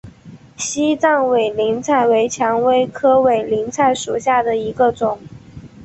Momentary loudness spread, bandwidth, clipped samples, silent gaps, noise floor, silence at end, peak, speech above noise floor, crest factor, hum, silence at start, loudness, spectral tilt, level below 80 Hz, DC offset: 7 LU; 8.4 kHz; under 0.1%; none; -41 dBFS; 0 s; -2 dBFS; 25 dB; 14 dB; none; 0.05 s; -16 LUFS; -4 dB/octave; -52 dBFS; under 0.1%